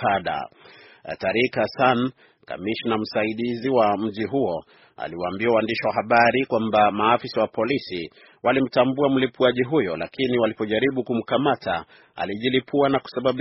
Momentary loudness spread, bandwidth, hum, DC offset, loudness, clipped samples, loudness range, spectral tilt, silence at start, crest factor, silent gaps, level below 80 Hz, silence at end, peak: 12 LU; 6 kHz; none; under 0.1%; -22 LUFS; under 0.1%; 3 LU; -3.5 dB/octave; 0 s; 20 dB; none; -58 dBFS; 0 s; -2 dBFS